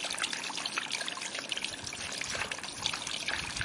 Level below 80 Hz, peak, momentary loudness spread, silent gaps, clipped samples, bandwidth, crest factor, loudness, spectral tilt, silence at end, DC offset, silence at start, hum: -60 dBFS; -12 dBFS; 4 LU; none; under 0.1%; 11.5 kHz; 24 dB; -34 LUFS; -0.5 dB/octave; 0 s; under 0.1%; 0 s; none